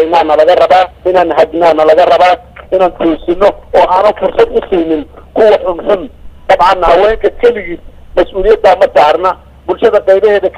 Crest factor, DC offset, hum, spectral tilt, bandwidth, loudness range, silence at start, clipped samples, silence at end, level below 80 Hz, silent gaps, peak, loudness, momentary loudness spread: 8 dB; under 0.1%; none; -5.5 dB/octave; 11 kHz; 2 LU; 0 s; 0.6%; 0 s; -30 dBFS; none; 0 dBFS; -9 LUFS; 10 LU